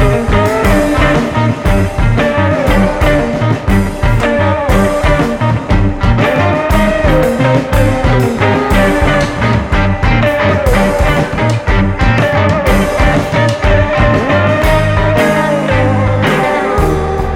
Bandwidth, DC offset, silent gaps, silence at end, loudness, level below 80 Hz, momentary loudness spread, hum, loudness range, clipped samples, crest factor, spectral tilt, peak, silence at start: 17 kHz; under 0.1%; none; 0 s; -11 LUFS; -18 dBFS; 3 LU; none; 1 LU; under 0.1%; 10 dB; -6.5 dB/octave; 0 dBFS; 0 s